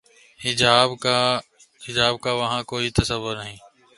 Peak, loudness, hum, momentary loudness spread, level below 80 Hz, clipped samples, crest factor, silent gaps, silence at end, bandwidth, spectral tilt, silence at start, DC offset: 0 dBFS; -21 LUFS; none; 13 LU; -44 dBFS; under 0.1%; 22 dB; none; 0.4 s; 11.5 kHz; -3.5 dB/octave; 0.4 s; under 0.1%